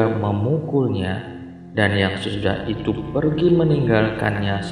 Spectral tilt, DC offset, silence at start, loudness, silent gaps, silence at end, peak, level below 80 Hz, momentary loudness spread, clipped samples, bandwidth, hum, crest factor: -7.5 dB/octave; under 0.1%; 0 s; -20 LUFS; none; 0 s; -2 dBFS; -44 dBFS; 9 LU; under 0.1%; 10.5 kHz; none; 18 dB